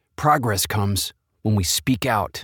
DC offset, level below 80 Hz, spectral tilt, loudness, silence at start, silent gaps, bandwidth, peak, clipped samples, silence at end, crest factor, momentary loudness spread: under 0.1%; -44 dBFS; -4 dB/octave; -21 LUFS; 0.2 s; none; 19.5 kHz; -4 dBFS; under 0.1%; 0 s; 18 dB; 6 LU